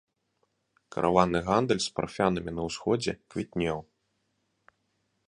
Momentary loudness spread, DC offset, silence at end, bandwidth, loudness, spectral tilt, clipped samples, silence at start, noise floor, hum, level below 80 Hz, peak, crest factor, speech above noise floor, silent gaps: 10 LU; under 0.1%; 1.45 s; 11 kHz; -28 LUFS; -5.5 dB/octave; under 0.1%; 0.9 s; -76 dBFS; none; -54 dBFS; -6 dBFS; 24 dB; 48 dB; none